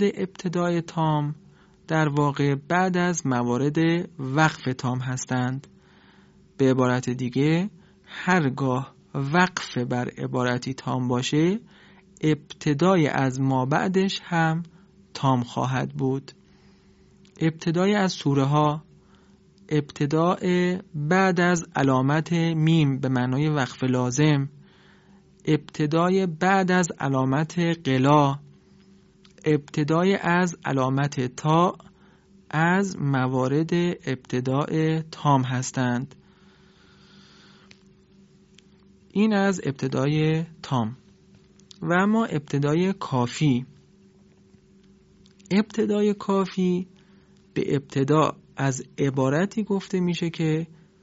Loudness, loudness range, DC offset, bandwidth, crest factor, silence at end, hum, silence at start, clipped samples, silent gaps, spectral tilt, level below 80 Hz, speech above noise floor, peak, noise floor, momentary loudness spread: -24 LUFS; 5 LU; under 0.1%; 8 kHz; 20 dB; 0.35 s; none; 0 s; under 0.1%; none; -6 dB/octave; -62 dBFS; 32 dB; -4 dBFS; -55 dBFS; 8 LU